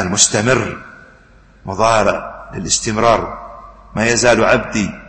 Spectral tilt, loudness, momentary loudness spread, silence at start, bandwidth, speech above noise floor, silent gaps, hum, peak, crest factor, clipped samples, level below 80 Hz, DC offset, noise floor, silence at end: -3 dB/octave; -14 LUFS; 17 LU; 0 s; 10.5 kHz; 31 dB; none; none; 0 dBFS; 16 dB; under 0.1%; -40 dBFS; under 0.1%; -46 dBFS; 0 s